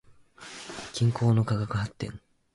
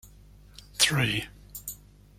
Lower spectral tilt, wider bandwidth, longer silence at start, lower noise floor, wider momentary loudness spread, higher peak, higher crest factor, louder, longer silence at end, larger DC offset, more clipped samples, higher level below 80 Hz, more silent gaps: first, -6.5 dB/octave vs -2.5 dB/octave; second, 11.5 kHz vs 16.5 kHz; about the same, 0.1 s vs 0.05 s; about the same, -49 dBFS vs -52 dBFS; about the same, 20 LU vs 19 LU; second, -14 dBFS vs -6 dBFS; second, 14 dB vs 24 dB; second, -28 LUFS vs -25 LUFS; about the same, 0.4 s vs 0.45 s; neither; neither; about the same, -54 dBFS vs -52 dBFS; neither